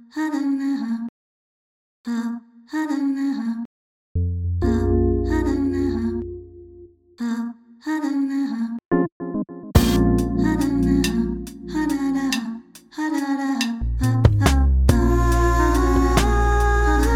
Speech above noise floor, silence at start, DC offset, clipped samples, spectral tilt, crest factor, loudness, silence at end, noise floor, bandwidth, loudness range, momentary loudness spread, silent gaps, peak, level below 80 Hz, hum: 23 dB; 0.15 s; under 0.1%; under 0.1%; -6.5 dB/octave; 20 dB; -21 LUFS; 0 s; -46 dBFS; 18 kHz; 8 LU; 12 LU; 1.09-2.04 s, 3.65-4.15 s, 8.85-8.89 s, 9.12-9.20 s; 0 dBFS; -26 dBFS; none